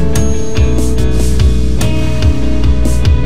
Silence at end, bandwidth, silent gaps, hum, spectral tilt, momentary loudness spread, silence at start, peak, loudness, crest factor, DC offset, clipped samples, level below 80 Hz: 0 s; 14.5 kHz; none; none; -6 dB/octave; 2 LU; 0 s; 0 dBFS; -14 LUFS; 12 dB; 20%; under 0.1%; -14 dBFS